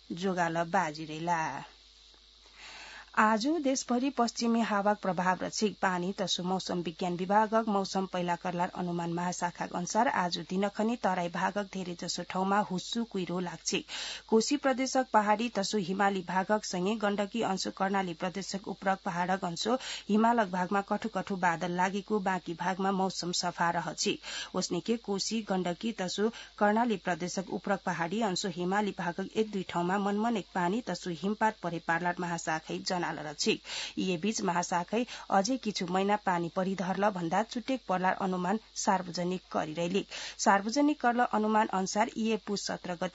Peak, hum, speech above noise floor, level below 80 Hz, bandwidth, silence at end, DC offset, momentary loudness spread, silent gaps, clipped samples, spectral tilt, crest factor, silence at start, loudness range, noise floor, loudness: -10 dBFS; none; 27 dB; -66 dBFS; 8 kHz; 0.05 s; under 0.1%; 7 LU; none; under 0.1%; -3.5 dB/octave; 22 dB; 0.1 s; 3 LU; -58 dBFS; -31 LUFS